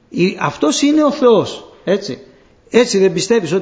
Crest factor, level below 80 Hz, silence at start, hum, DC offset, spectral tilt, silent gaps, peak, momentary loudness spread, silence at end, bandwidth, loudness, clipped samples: 14 dB; -56 dBFS; 0.1 s; none; under 0.1%; -4.5 dB/octave; none; 0 dBFS; 13 LU; 0 s; 8 kHz; -14 LUFS; under 0.1%